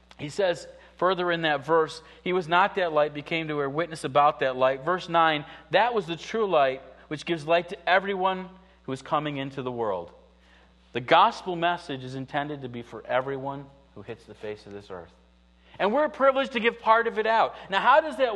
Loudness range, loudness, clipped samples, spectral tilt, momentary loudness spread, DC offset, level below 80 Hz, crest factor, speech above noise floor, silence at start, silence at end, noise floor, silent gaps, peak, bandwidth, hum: 7 LU; -25 LUFS; under 0.1%; -5 dB/octave; 17 LU; under 0.1%; -60 dBFS; 22 dB; 33 dB; 0.2 s; 0 s; -58 dBFS; none; -4 dBFS; 11.5 kHz; none